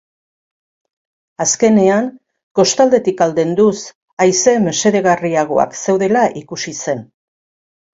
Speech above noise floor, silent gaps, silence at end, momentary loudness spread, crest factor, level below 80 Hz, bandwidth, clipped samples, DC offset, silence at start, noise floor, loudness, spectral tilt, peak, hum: over 76 dB; 2.43-2.55 s, 3.95-4.17 s; 0.9 s; 12 LU; 16 dB; -58 dBFS; 8 kHz; under 0.1%; under 0.1%; 1.4 s; under -90 dBFS; -14 LUFS; -4 dB/octave; 0 dBFS; none